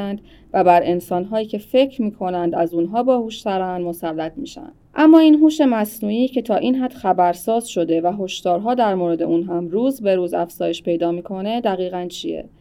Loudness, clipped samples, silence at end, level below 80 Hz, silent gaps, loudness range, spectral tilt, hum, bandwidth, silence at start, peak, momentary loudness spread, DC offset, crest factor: -19 LUFS; under 0.1%; 0.15 s; -54 dBFS; none; 5 LU; -6 dB/octave; none; 16 kHz; 0 s; 0 dBFS; 11 LU; under 0.1%; 18 dB